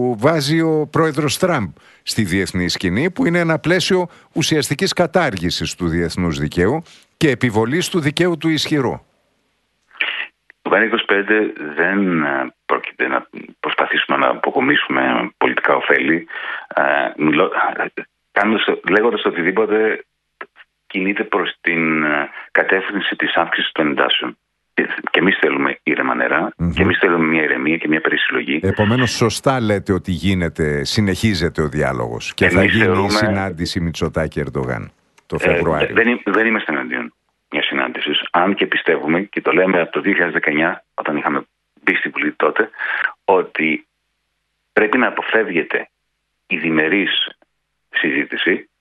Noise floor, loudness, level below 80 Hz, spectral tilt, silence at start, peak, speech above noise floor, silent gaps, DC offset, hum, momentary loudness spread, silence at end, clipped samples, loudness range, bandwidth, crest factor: -71 dBFS; -17 LUFS; -44 dBFS; -5 dB/octave; 0 s; 0 dBFS; 54 dB; none; under 0.1%; none; 8 LU; 0.15 s; under 0.1%; 3 LU; 12 kHz; 18 dB